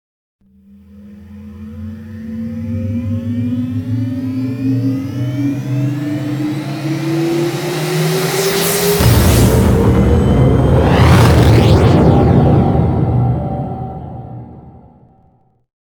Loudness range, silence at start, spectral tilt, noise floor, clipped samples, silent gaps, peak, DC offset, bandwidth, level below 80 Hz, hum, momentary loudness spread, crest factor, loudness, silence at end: 11 LU; 0.95 s; -6.5 dB/octave; -53 dBFS; under 0.1%; none; 0 dBFS; under 0.1%; over 20 kHz; -24 dBFS; none; 19 LU; 14 dB; -13 LUFS; 1.15 s